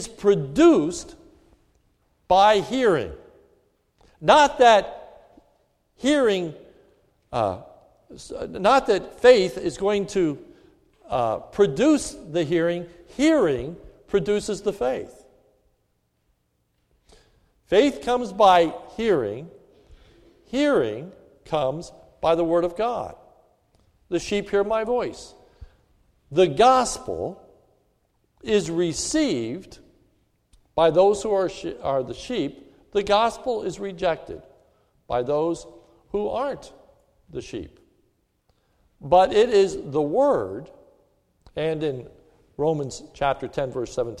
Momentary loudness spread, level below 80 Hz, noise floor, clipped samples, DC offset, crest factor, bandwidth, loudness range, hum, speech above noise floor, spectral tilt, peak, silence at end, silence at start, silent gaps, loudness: 19 LU; -52 dBFS; -70 dBFS; under 0.1%; under 0.1%; 20 dB; 12.5 kHz; 7 LU; none; 49 dB; -5 dB/octave; -2 dBFS; 0.05 s; 0 s; none; -22 LUFS